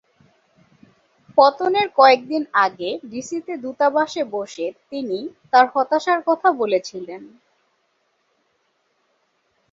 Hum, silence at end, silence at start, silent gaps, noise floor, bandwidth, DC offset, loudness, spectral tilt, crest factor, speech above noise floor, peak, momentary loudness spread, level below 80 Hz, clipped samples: none; 2.45 s; 1.35 s; none; -68 dBFS; 7.8 kHz; under 0.1%; -19 LUFS; -3.5 dB/octave; 20 dB; 48 dB; -2 dBFS; 15 LU; -70 dBFS; under 0.1%